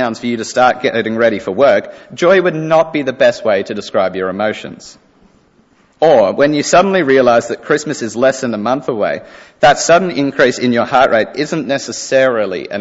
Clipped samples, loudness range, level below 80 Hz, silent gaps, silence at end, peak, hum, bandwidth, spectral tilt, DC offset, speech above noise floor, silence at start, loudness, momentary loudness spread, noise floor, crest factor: under 0.1%; 3 LU; -50 dBFS; none; 0 s; 0 dBFS; none; 8 kHz; -4.5 dB/octave; under 0.1%; 38 dB; 0 s; -13 LUFS; 8 LU; -51 dBFS; 14 dB